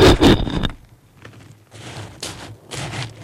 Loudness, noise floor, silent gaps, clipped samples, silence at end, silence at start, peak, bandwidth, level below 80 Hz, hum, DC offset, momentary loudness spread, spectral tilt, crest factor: -19 LUFS; -47 dBFS; none; under 0.1%; 0 s; 0 s; -4 dBFS; 16.5 kHz; -28 dBFS; none; under 0.1%; 22 LU; -5.5 dB/octave; 16 dB